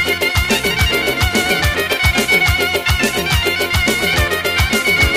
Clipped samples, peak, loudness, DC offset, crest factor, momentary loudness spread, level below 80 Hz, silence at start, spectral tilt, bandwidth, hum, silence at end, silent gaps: under 0.1%; -2 dBFS; -14 LUFS; under 0.1%; 14 dB; 3 LU; -24 dBFS; 0 s; -3.5 dB/octave; 15.5 kHz; none; 0 s; none